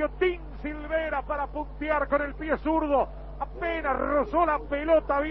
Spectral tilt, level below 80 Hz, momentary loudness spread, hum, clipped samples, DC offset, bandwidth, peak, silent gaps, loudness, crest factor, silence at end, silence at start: -9 dB/octave; -40 dBFS; 10 LU; none; under 0.1%; 0.1%; 5.6 kHz; -10 dBFS; none; -28 LUFS; 16 dB; 0 s; 0 s